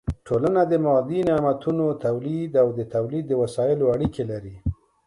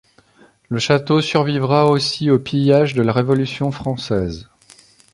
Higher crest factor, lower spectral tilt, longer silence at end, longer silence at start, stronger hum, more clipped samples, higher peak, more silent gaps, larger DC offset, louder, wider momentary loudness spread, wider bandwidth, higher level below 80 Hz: about the same, 16 dB vs 16 dB; first, -8.5 dB/octave vs -6.5 dB/octave; second, 0.35 s vs 0.7 s; second, 0.05 s vs 0.7 s; neither; neither; second, -8 dBFS vs -2 dBFS; neither; neither; second, -23 LUFS vs -17 LUFS; about the same, 10 LU vs 8 LU; about the same, 11.5 kHz vs 11.5 kHz; about the same, -42 dBFS vs -46 dBFS